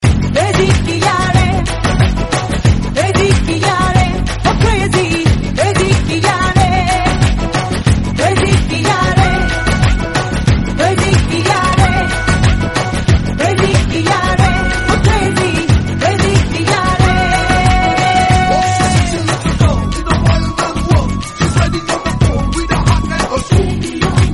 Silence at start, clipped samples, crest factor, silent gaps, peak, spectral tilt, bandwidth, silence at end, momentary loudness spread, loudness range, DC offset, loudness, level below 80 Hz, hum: 0 s; under 0.1%; 12 dB; none; 0 dBFS; -5.5 dB/octave; 11.5 kHz; 0 s; 4 LU; 2 LU; under 0.1%; -13 LUFS; -20 dBFS; none